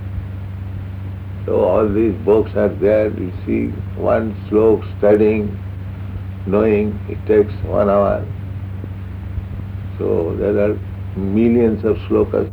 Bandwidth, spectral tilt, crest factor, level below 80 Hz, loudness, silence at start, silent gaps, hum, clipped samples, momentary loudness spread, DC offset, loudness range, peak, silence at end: 4.7 kHz; -10.5 dB/octave; 14 dB; -36 dBFS; -18 LUFS; 0 s; none; none; under 0.1%; 14 LU; under 0.1%; 3 LU; -2 dBFS; 0 s